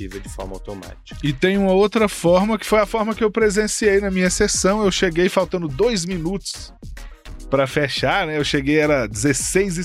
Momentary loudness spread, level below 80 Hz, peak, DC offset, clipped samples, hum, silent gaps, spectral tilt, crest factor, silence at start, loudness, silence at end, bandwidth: 15 LU; -36 dBFS; -4 dBFS; under 0.1%; under 0.1%; none; none; -4.5 dB/octave; 16 dB; 0 s; -18 LUFS; 0 s; 15.5 kHz